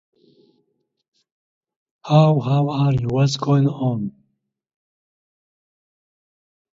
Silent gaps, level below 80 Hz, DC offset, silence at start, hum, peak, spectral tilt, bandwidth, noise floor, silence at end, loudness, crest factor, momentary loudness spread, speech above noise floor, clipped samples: none; -54 dBFS; under 0.1%; 2.05 s; none; 0 dBFS; -7.5 dB/octave; 7.6 kHz; -72 dBFS; 2.65 s; -19 LUFS; 22 dB; 8 LU; 55 dB; under 0.1%